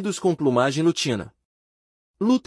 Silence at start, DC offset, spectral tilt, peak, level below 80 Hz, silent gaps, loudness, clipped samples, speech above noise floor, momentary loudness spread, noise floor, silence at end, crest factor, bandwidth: 0 s; under 0.1%; -5 dB/octave; -6 dBFS; -64 dBFS; 1.45-2.14 s; -22 LUFS; under 0.1%; over 68 dB; 8 LU; under -90 dBFS; 0.05 s; 16 dB; 12 kHz